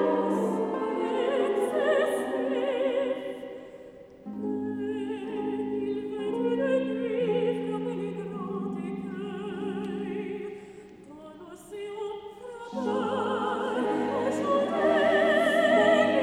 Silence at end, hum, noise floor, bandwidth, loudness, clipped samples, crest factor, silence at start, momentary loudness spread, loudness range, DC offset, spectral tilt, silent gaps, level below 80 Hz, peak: 0 s; none; -48 dBFS; 14.5 kHz; -28 LUFS; under 0.1%; 18 dB; 0 s; 19 LU; 10 LU; under 0.1%; -6 dB/octave; none; -66 dBFS; -10 dBFS